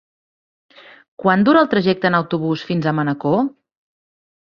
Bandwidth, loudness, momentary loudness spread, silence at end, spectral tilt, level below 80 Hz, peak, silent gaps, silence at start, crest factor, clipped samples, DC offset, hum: 6.6 kHz; -17 LUFS; 8 LU; 1.05 s; -8.5 dB/octave; -60 dBFS; -2 dBFS; none; 1.2 s; 18 dB; under 0.1%; under 0.1%; none